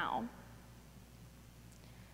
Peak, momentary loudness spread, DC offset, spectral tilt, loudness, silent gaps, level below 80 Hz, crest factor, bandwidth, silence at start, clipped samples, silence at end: -24 dBFS; 17 LU; under 0.1%; -5 dB/octave; -49 LUFS; none; -62 dBFS; 22 dB; 16 kHz; 0 s; under 0.1%; 0 s